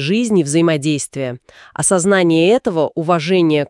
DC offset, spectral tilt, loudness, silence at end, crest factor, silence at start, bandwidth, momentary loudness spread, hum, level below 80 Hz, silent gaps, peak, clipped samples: under 0.1%; -5 dB/octave; -15 LUFS; 0.05 s; 14 dB; 0 s; 12 kHz; 12 LU; none; -56 dBFS; none; -2 dBFS; under 0.1%